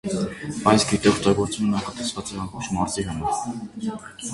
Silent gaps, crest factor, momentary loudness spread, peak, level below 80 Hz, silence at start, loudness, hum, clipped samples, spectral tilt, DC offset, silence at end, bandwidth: none; 22 dB; 13 LU; -2 dBFS; -46 dBFS; 0.05 s; -24 LUFS; none; under 0.1%; -4.5 dB/octave; under 0.1%; 0 s; 11.5 kHz